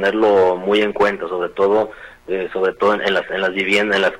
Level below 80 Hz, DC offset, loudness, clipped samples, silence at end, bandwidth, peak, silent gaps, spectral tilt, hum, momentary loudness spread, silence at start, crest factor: -52 dBFS; under 0.1%; -17 LUFS; under 0.1%; 0 s; 11 kHz; -4 dBFS; none; -5 dB/octave; none; 9 LU; 0 s; 14 dB